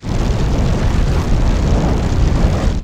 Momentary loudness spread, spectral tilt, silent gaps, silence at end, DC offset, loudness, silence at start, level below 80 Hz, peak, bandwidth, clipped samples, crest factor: 2 LU; -7 dB/octave; none; 0 s; under 0.1%; -17 LUFS; 0 s; -16 dBFS; -2 dBFS; 9.8 kHz; under 0.1%; 12 dB